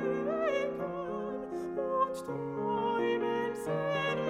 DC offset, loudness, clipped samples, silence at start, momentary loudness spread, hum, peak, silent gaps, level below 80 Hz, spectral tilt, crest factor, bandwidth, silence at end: under 0.1%; -33 LUFS; under 0.1%; 0 s; 7 LU; none; -18 dBFS; none; -66 dBFS; -6 dB/octave; 14 dB; 15.5 kHz; 0 s